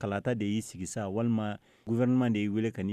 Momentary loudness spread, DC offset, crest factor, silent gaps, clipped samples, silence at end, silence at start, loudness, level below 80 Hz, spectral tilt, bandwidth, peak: 10 LU; under 0.1%; 12 dB; none; under 0.1%; 0 s; 0 s; -31 LUFS; -66 dBFS; -6.5 dB/octave; 13 kHz; -18 dBFS